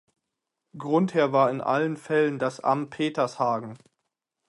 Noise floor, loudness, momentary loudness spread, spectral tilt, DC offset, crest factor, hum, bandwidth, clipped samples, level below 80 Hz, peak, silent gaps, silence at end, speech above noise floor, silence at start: -83 dBFS; -25 LUFS; 6 LU; -6.5 dB/octave; under 0.1%; 18 dB; none; 11.5 kHz; under 0.1%; -74 dBFS; -8 dBFS; none; 0.7 s; 59 dB; 0.75 s